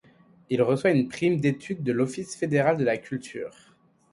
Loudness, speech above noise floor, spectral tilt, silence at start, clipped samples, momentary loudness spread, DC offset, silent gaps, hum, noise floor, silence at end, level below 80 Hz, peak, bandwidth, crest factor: -25 LUFS; 32 dB; -6.5 dB/octave; 0.5 s; under 0.1%; 12 LU; under 0.1%; none; none; -57 dBFS; 0.65 s; -66 dBFS; -8 dBFS; 11.5 kHz; 18 dB